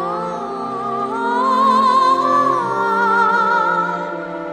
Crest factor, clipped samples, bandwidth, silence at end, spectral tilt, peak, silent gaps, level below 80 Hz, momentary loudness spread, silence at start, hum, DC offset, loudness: 14 dB; under 0.1%; 13.5 kHz; 0 s; -5 dB/octave; -4 dBFS; none; -60 dBFS; 11 LU; 0 s; none; under 0.1%; -16 LUFS